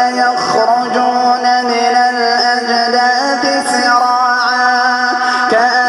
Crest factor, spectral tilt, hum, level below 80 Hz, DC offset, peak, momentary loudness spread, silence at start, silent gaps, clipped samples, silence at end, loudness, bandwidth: 12 dB; -1.5 dB/octave; none; -60 dBFS; under 0.1%; 0 dBFS; 2 LU; 0 s; none; under 0.1%; 0 s; -12 LUFS; 12 kHz